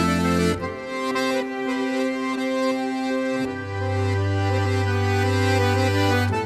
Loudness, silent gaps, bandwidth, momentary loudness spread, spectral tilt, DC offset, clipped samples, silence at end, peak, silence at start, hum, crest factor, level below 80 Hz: -23 LUFS; none; 14 kHz; 6 LU; -6 dB/octave; under 0.1%; under 0.1%; 0 s; -8 dBFS; 0 s; none; 14 dB; -50 dBFS